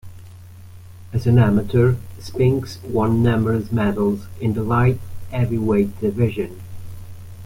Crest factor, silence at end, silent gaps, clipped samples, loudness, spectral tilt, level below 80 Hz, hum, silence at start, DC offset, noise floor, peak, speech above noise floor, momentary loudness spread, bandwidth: 16 dB; 0 s; none; under 0.1%; -20 LUFS; -8.5 dB/octave; -42 dBFS; none; 0.05 s; under 0.1%; -40 dBFS; -4 dBFS; 21 dB; 15 LU; 16 kHz